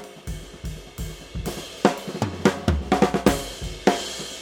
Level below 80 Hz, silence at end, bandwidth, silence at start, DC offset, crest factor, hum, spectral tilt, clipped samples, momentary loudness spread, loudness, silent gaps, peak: -36 dBFS; 0 s; 19 kHz; 0 s; under 0.1%; 24 dB; none; -5 dB/octave; under 0.1%; 15 LU; -24 LUFS; none; -2 dBFS